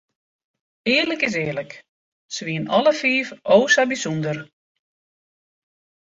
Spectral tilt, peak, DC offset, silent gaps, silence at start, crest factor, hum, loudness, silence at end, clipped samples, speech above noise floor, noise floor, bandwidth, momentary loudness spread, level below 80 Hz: -4 dB/octave; -2 dBFS; under 0.1%; 1.89-2.29 s; 0.85 s; 20 dB; none; -20 LUFS; 1.6 s; under 0.1%; over 70 dB; under -90 dBFS; 8 kHz; 14 LU; -64 dBFS